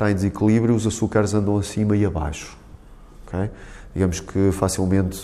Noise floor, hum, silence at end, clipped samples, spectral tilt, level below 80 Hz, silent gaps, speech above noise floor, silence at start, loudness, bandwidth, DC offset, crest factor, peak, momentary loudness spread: -43 dBFS; none; 0 s; under 0.1%; -6.5 dB/octave; -38 dBFS; none; 22 dB; 0 s; -21 LUFS; 14 kHz; under 0.1%; 16 dB; -6 dBFS; 13 LU